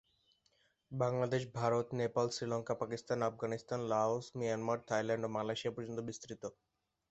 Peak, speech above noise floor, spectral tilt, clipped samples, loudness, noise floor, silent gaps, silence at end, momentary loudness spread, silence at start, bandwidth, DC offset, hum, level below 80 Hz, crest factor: -18 dBFS; 39 dB; -5.5 dB/octave; under 0.1%; -37 LUFS; -76 dBFS; none; 0.6 s; 9 LU; 0.9 s; 8.2 kHz; under 0.1%; none; -74 dBFS; 20 dB